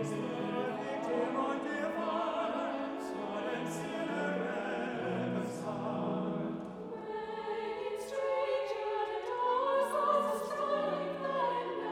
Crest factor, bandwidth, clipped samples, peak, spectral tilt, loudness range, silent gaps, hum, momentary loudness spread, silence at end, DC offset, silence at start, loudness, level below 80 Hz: 16 dB; 16.5 kHz; under 0.1%; -18 dBFS; -6 dB/octave; 4 LU; none; none; 7 LU; 0 s; under 0.1%; 0 s; -35 LUFS; -72 dBFS